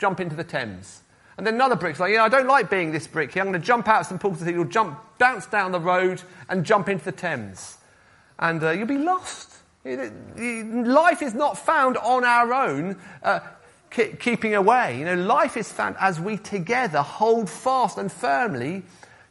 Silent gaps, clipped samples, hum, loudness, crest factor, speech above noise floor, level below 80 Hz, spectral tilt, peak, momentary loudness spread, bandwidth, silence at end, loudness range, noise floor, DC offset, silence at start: none; under 0.1%; none; -22 LUFS; 20 dB; 33 dB; -66 dBFS; -5 dB/octave; -2 dBFS; 13 LU; 11.5 kHz; 0.45 s; 4 LU; -55 dBFS; under 0.1%; 0 s